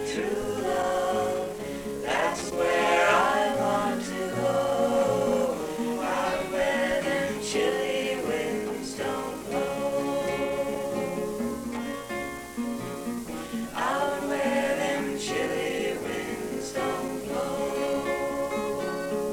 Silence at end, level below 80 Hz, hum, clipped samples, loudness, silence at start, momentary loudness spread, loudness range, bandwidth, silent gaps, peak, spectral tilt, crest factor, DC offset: 0 s; -54 dBFS; none; under 0.1%; -28 LUFS; 0 s; 9 LU; 6 LU; 19 kHz; none; -8 dBFS; -4 dB/octave; 18 dB; under 0.1%